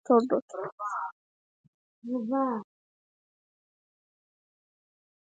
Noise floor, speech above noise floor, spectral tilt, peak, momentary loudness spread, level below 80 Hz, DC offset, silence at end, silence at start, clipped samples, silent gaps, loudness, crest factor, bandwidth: under -90 dBFS; over 62 dB; -7 dB/octave; -12 dBFS; 15 LU; -86 dBFS; under 0.1%; 2.6 s; 0.1 s; under 0.1%; 0.42-0.48 s, 0.72-0.78 s, 1.12-2.02 s; -30 LUFS; 22 dB; 7.8 kHz